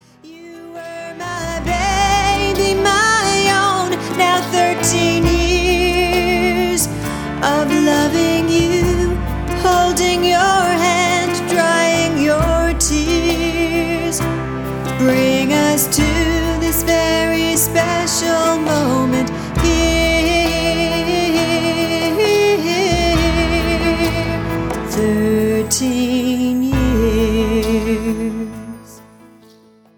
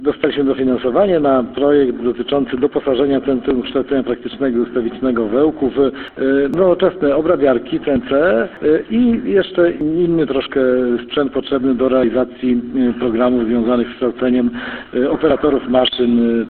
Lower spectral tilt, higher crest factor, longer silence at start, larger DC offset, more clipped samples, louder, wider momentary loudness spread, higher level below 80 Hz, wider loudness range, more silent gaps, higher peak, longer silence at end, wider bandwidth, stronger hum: second, -4 dB/octave vs -9.5 dB/octave; about the same, 14 dB vs 16 dB; first, 0.25 s vs 0 s; neither; neither; about the same, -15 LUFS vs -16 LUFS; about the same, 7 LU vs 5 LU; first, -28 dBFS vs -44 dBFS; about the same, 2 LU vs 2 LU; neither; about the same, -2 dBFS vs 0 dBFS; first, 1 s vs 0 s; first, 19.5 kHz vs 4.4 kHz; neither